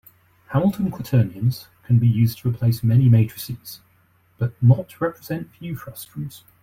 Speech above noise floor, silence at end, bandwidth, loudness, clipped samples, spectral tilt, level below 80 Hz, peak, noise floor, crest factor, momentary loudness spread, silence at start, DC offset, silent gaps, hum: 39 dB; 0.25 s; 16 kHz; -20 LUFS; under 0.1%; -8 dB/octave; -52 dBFS; -4 dBFS; -59 dBFS; 18 dB; 17 LU; 0.5 s; under 0.1%; none; none